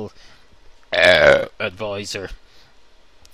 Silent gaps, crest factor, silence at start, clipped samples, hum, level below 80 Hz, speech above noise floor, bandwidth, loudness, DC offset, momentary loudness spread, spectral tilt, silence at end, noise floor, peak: none; 20 dB; 0 s; under 0.1%; none; -44 dBFS; 34 dB; 15 kHz; -16 LUFS; 0.4%; 20 LU; -3.5 dB/octave; 1 s; -52 dBFS; 0 dBFS